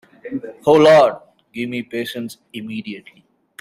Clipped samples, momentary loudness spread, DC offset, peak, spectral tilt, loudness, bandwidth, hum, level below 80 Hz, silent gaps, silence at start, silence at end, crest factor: under 0.1%; 23 LU; under 0.1%; -2 dBFS; -5.5 dB/octave; -15 LUFS; 15 kHz; none; -60 dBFS; none; 0.25 s; 0.6 s; 18 dB